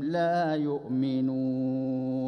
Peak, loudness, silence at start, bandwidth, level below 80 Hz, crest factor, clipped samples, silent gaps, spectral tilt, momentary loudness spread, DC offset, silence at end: -16 dBFS; -28 LUFS; 0 s; 6.2 kHz; -70 dBFS; 12 dB; under 0.1%; none; -8.5 dB/octave; 4 LU; under 0.1%; 0 s